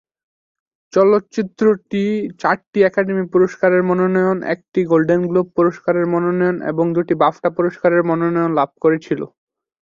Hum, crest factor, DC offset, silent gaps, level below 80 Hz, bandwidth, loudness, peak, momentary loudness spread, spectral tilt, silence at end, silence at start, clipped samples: none; 16 dB; under 0.1%; 2.67-2.73 s; -60 dBFS; 7.2 kHz; -17 LUFS; -2 dBFS; 6 LU; -8 dB/octave; 0.65 s; 0.95 s; under 0.1%